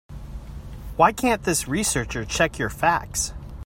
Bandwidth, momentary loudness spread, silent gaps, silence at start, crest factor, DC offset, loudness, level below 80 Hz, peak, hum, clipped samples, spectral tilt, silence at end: 16.5 kHz; 19 LU; none; 0.1 s; 22 dB; under 0.1%; -22 LUFS; -38 dBFS; -2 dBFS; none; under 0.1%; -3.5 dB/octave; 0 s